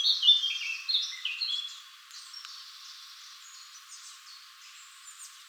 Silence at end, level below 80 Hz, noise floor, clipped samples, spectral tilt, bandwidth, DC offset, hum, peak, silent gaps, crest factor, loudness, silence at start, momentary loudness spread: 0 s; under -90 dBFS; -51 dBFS; under 0.1%; 12 dB/octave; over 20 kHz; under 0.1%; none; -10 dBFS; none; 24 dB; -26 LUFS; 0 s; 25 LU